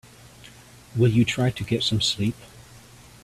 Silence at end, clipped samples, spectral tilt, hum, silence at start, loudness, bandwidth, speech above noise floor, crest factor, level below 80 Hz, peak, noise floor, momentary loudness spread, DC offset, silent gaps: 0.45 s; under 0.1%; -5 dB/octave; none; 0.45 s; -23 LUFS; 14 kHz; 26 dB; 18 dB; -52 dBFS; -8 dBFS; -48 dBFS; 10 LU; under 0.1%; none